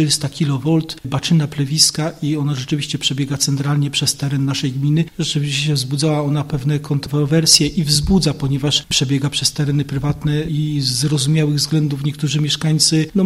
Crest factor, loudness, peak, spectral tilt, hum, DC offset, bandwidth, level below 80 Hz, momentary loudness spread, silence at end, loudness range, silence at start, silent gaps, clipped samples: 18 dB; -17 LUFS; 0 dBFS; -4.5 dB/octave; none; under 0.1%; 15.5 kHz; -40 dBFS; 7 LU; 0 s; 3 LU; 0 s; none; under 0.1%